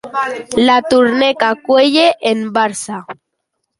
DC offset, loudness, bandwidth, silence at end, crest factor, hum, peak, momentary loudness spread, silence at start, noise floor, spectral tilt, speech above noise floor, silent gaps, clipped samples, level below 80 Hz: under 0.1%; -13 LUFS; 11.5 kHz; 0.65 s; 14 dB; none; 0 dBFS; 13 LU; 0.05 s; -73 dBFS; -3.5 dB/octave; 59 dB; none; under 0.1%; -54 dBFS